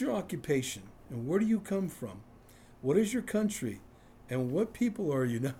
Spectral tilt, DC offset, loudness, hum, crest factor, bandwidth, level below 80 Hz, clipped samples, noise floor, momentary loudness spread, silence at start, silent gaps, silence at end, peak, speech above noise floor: -6 dB/octave; under 0.1%; -32 LUFS; none; 18 dB; 16.5 kHz; -62 dBFS; under 0.1%; -56 dBFS; 15 LU; 0 s; none; 0 s; -14 dBFS; 24 dB